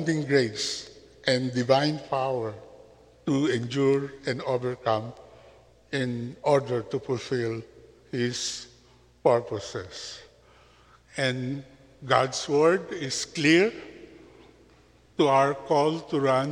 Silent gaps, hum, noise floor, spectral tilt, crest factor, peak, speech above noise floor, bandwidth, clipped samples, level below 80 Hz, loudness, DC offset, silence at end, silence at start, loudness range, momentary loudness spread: none; none; -57 dBFS; -5 dB/octave; 24 dB; -4 dBFS; 32 dB; 11.5 kHz; under 0.1%; -62 dBFS; -26 LUFS; under 0.1%; 0 s; 0 s; 6 LU; 16 LU